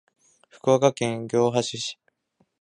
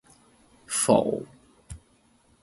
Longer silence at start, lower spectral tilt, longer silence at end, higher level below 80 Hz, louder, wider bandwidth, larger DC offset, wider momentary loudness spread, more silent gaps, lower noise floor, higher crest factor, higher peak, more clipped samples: about the same, 0.65 s vs 0.7 s; about the same, -5 dB/octave vs -4 dB/octave; about the same, 0.7 s vs 0.65 s; second, -66 dBFS vs -56 dBFS; about the same, -24 LUFS vs -24 LUFS; about the same, 11 kHz vs 12 kHz; neither; second, 10 LU vs 25 LU; neither; first, -69 dBFS vs -63 dBFS; about the same, 22 dB vs 24 dB; first, -2 dBFS vs -6 dBFS; neither